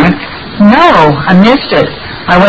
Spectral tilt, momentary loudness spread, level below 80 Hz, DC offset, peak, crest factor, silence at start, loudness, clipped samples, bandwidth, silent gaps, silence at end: -7.5 dB/octave; 13 LU; -32 dBFS; under 0.1%; 0 dBFS; 6 dB; 0 s; -7 LUFS; 4%; 8 kHz; none; 0 s